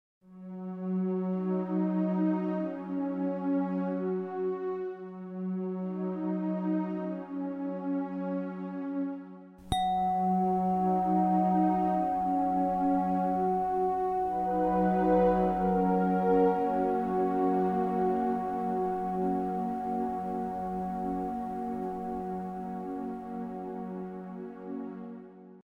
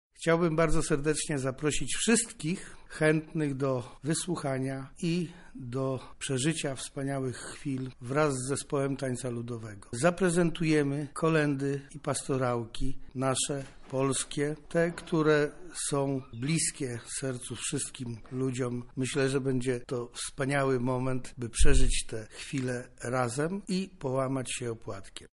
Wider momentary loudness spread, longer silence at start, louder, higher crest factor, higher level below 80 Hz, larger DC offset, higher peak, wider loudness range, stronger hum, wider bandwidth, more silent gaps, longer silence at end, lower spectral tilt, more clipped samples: about the same, 12 LU vs 10 LU; about the same, 0.3 s vs 0.2 s; about the same, -30 LUFS vs -31 LUFS; about the same, 18 dB vs 20 dB; second, -56 dBFS vs -38 dBFS; neither; second, -12 dBFS vs -8 dBFS; first, 8 LU vs 4 LU; neither; about the same, 10.5 kHz vs 11.5 kHz; neither; about the same, 0.05 s vs 0.05 s; first, -9 dB/octave vs -5 dB/octave; neither